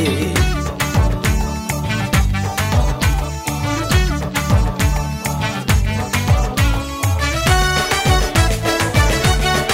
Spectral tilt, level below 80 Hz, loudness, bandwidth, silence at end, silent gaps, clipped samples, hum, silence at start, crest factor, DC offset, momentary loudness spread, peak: -4.5 dB/octave; -22 dBFS; -17 LUFS; 16.5 kHz; 0 s; none; under 0.1%; none; 0 s; 14 dB; under 0.1%; 5 LU; -2 dBFS